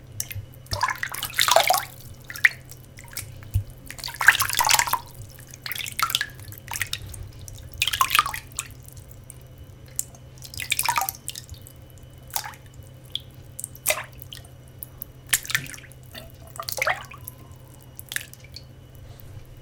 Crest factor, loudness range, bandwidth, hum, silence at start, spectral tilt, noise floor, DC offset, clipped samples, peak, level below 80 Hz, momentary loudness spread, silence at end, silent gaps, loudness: 28 dB; 9 LU; 19 kHz; none; 0 s; -1 dB/octave; -45 dBFS; under 0.1%; under 0.1%; 0 dBFS; -48 dBFS; 25 LU; 0 s; none; -24 LUFS